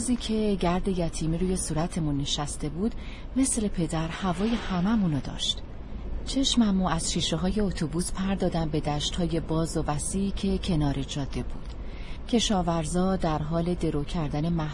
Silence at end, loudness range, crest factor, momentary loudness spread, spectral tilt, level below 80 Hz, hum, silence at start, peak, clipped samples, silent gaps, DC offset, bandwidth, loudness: 0 s; 2 LU; 16 dB; 8 LU; -5 dB/octave; -36 dBFS; none; 0 s; -12 dBFS; under 0.1%; none; under 0.1%; 11.5 kHz; -28 LUFS